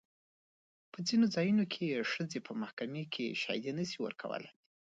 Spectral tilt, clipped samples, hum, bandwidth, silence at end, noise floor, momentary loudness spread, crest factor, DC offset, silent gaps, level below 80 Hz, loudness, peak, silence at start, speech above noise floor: -5 dB/octave; under 0.1%; none; 7.8 kHz; 0.4 s; under -90 dBFS; 12 LU; 18 dB; under 0.1%; 2.73-2.77 s; -82 dBFS; -36 LUFS; -20 dBFS; 0.95 s; over 55 dB